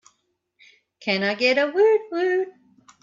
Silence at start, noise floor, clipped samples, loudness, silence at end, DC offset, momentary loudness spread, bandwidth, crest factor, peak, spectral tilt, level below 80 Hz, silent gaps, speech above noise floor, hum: 1 s; -71 dBFS; under 0.1%; -21 LUFS; 0.55 s; under 0.1%; 9 LU; 7.4 kHz; 16 dB; -8 dBFS; -5 dB/octave; -74 dBFS; none; 51 dB; none